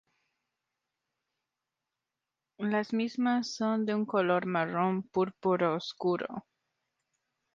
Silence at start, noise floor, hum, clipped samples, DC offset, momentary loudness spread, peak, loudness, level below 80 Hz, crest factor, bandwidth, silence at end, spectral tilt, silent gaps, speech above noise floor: 2.6 s; -89 dBFS; none; under 0.1%; under 0.1%; 4 LU; -14 dBFS; -31 LUFS; -76 dBFS; 18 dB; 7.4 kHz; 1.15 s; -6 dB/octave; none; 59 dB